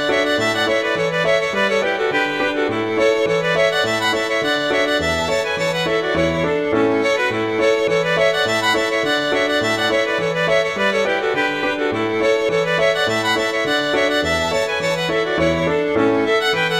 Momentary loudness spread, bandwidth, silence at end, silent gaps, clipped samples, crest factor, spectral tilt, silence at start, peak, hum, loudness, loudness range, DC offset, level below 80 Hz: 3 LU; 15.5 kHz; 0 s; none; under 0.1%; 14 dB; -4 dB/octave; 0 s; -4 dBFS; none; -17 LUFS; 1 LU; 0.1%; -46 dBFS